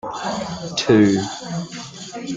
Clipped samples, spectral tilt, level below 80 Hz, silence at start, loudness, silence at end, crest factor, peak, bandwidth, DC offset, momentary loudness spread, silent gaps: under 0.1%; -5 dB/octave; -54 dBFS; 0.05 s; -20 LUFS; 0 s; 18 dB; -2 dBFS; 9.4 kHz; under 0.1%; 17 LU; none